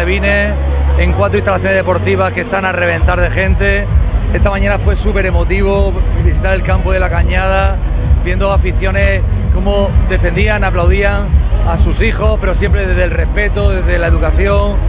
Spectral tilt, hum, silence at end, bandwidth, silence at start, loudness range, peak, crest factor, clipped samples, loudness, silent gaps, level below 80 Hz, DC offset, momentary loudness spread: -10.5 dB/octave; none; 0 s; 4 kHz; 0 s; 1 LU; 0 dBFS; 10 dB; under 0.1%; -13 LUFS; none; -12 dBFS; under 0.1%; 2 LU